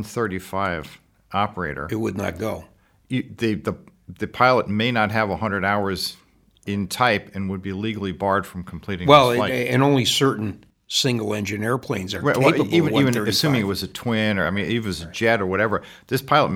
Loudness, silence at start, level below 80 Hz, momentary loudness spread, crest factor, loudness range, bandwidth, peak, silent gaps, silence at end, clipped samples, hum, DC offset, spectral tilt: -21 LUFS; 0 s; -52 dBFS; 12 LU; 22 dB; 7 LU; 17.5 kHz; 0 dBFS; none; 0 s; under 0.1%; none; under 0.1%; -5 dB/octave